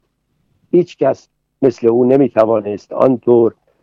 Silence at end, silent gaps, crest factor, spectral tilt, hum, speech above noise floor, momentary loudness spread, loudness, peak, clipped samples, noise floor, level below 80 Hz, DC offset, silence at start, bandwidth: 0.3 s; none; 14 dB; -9 dB/octave; none; 52 dB; 6 LU; -14 LUFS; 0 dBFS; under 0.1%; -64 dBFS; -62 dBFS; under 0.1%; 0.75 s; 7 kHz